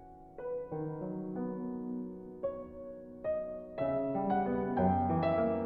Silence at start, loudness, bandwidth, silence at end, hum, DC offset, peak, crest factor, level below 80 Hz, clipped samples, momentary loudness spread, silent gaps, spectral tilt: 0 s; -35 LUFS; 4.9 kHz; 0 s; none; under 0.1%; -18 dBFS; 16 dB; -60 dBFS; under 0.1%; 14 LU; none; -11 dB/octave